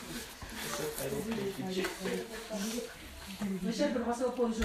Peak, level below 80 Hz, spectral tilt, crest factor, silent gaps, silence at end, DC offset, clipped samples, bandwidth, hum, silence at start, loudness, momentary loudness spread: -16 dBFS; -56 dBFS; -4.5 dB/octave; 20 dB; none; 0 s; under 0.1%; under 0.1%; 15.5 kHz; none; 0 s; -36 LUFS; 10 LU